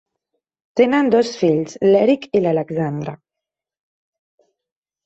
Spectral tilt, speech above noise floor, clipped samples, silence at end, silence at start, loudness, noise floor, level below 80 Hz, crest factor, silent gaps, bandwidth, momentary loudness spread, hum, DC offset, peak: -6.5 dB/octave; 69 dB; under 0.1%; 1.9 s; 0.75 s; -17 LUFS; -85 dBFS; -62 dBFS; 16 dB; none; 8.2 kHz; 10 LU; none; under 0.1%; -2 dBFS